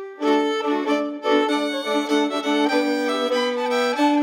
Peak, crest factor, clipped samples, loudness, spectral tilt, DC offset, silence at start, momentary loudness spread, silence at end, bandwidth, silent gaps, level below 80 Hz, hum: -6 dBFS; 16 dB; under 0.1%; -21 LUFS; -3 dB/octave; under 0.1%; 0 s; 3 LU; 0 s; 16.5 kHz; none; -88 dBFS; none